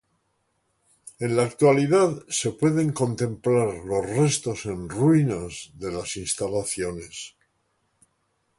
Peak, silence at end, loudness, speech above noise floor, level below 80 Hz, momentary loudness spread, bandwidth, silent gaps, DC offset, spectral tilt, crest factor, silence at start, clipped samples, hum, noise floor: -6 dBFS; 1.3 s; -24 LUFS; 49 dB; -54 dBFS; 13 LU; 11.5 kHz; none; under 0.1%; -5.5 dB/octave; 18 dB; 1.05 s; under 0.1%; none; -72 dBFS